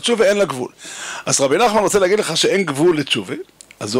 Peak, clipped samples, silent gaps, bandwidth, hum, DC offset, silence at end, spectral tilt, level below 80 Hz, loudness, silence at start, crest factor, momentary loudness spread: -2 dBFS; under 0.1%; none; 16 kHz; none; under 0.1%; 0 s; -3 dB/octave; -54 dBFS; -16 LUFS; 0 s; 16 dB; 15 LU